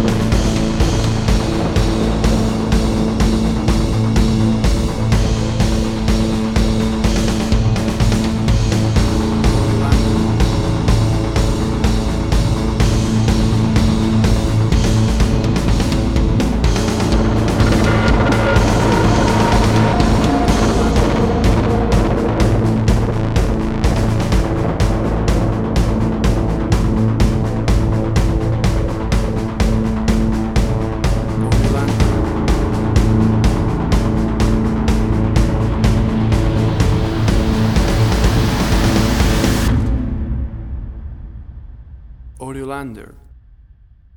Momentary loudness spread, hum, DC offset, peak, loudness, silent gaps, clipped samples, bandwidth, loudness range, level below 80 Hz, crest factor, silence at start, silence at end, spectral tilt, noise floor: 4 LU; none; under 0.1%; 0 dBFS; -16 LUFS; none; under 0.1%; 17.5 kHz; 3 LU; -20 dBFS; 14 dB; 0 s; 0.95 s; -6.5 dB/octave; -45 dBFS